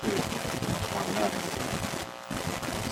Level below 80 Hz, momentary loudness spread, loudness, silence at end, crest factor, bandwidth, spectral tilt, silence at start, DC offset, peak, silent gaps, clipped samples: -52 dBFS; 5 LU; -31 LUFS; 0 s; 18 dB; 16.5 kHz; -4 dB/octave; 0 s; under 0.1%; -14 dBFS; none; under 0.1%